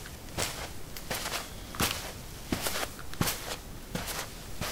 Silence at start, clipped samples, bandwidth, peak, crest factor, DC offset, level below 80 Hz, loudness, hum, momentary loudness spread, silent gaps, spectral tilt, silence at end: 0 s; under 0.1%; 17.5 kHz; -10 dBFS; 26 dB; under 0.1%; -46 dBFS; -35 LUFS; none; 10 LU; none; -3 dB/octave; 0 s